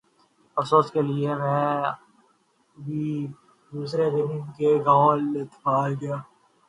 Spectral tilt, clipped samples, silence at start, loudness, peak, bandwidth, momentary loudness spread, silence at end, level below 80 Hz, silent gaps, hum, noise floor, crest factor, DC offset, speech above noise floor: -8 dB/octave; under 0.1%; 0.55 s; -24 LUFS; -6 dBFS; 11 kHz; 15 LU; 0.45 s; -70 dBFS; none; none; -65 dBFS; 20 dB; under 0.1%; 41 dB